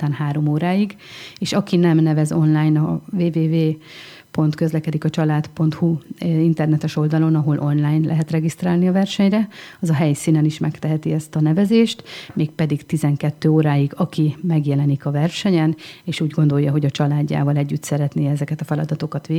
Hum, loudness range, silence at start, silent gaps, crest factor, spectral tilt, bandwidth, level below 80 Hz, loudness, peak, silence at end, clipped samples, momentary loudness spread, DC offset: none; 2 LU; 0 s; none; 14 dB; -7.5 dB/octave; 12.5 kHz; -60 dBFS; -19 LUFS; -4 dBFS; 0 s; under 0.1%; 7 LU; under 0.1%